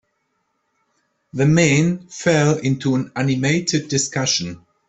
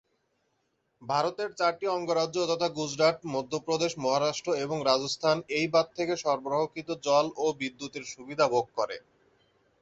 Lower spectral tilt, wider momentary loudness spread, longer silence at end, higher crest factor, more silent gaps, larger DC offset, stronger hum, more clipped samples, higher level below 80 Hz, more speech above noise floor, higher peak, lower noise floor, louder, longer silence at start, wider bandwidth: about the same, -4.5 dB/octave vs -4 dB/octave; about the same, 7 LU vs 8 LU; second, 0.3 s vs 0.8 s; about the same, 18 dB vs 20 dB; neither; neither; neither; neither; first, -54 dBFS vs -70 dBFS; first, 52 dB vs 47 dB; first, -2 dBFS vs -8 dBFS; second, -70 dBFS vs -76 dBFS; first, -18 LUFS vs -29 LUFS; first, 1.35 s vs 1 s; about the same, 8.4 kHz vs 8.2 kHz